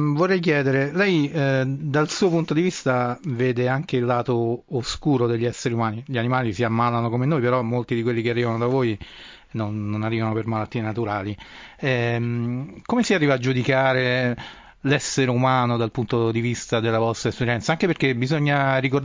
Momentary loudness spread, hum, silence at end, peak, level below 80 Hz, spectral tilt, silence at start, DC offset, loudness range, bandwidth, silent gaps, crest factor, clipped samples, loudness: 7 LU; none; 0 s; -6 dBFS; -52 dBFS; -6 dB/octave; 0 s; under 0.1%; 4 LU; 7.6 kHz; none; 16 dB; under 0.1%; -22 LUFS